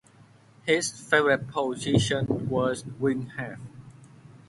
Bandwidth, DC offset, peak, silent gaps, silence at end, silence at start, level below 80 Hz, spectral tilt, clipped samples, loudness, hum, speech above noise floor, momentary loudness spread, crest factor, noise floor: 11.5 kHz; under 0.1%; -6 dBFS; none; 0.1 s; 0.65 s; -56 dBFS; -4.5 dB/octave; under 0.1%; -26 LUFS; none; 29 dB; 14 LU; 20 dB; -55 dBFS